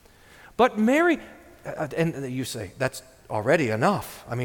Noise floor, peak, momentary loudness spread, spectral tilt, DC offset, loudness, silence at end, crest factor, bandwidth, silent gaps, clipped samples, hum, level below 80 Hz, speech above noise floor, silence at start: -51 dBFS; -6 dBFS; 15 LU; -6 dB/octave; under 0.1%; -25 LUFS; 0 s; 18 dB; 19 kHz; none; under 0.1%; none; -56 dBFS; 27 dB; 0.45 s